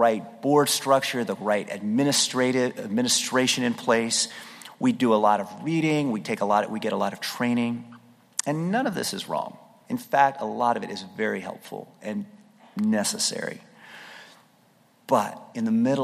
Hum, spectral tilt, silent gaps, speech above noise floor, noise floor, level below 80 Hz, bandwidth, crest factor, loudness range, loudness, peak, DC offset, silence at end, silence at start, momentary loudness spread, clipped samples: none; -3.5 dB/octave; none; 36 dB; -60 dBFS; -74 dBFS; 15.5 kHz; 22 dB; 6 LU; -25 LUFS; -2 dBFS; under 0.1%; 0 s; 0 s; 15 LU; under 0.1%